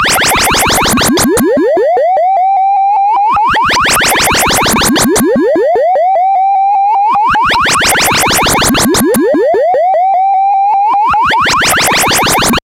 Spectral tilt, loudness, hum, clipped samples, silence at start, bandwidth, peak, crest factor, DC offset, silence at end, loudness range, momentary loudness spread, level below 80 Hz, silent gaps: -2.5 dB/octave; -8 LUFS; none; under 0.1%; 0 s; 17 kHz; 0 dBFS; 8 dB; under 0.1%; 0.05 s; 1 LU; 2 LU; -32 dBFS; none